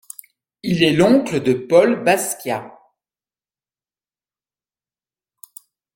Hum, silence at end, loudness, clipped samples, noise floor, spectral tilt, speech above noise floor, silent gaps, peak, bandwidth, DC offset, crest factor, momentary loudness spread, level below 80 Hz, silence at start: none; 3.25 s; -17 LUFS; under 0.1%; under -90 dBFS; -5 dB/octave; over 74 dB; none; -2 dBFS; 16.5 kHz; under 0.1%; 20 dB; 15 LU; -56 dBFS; 0.65 s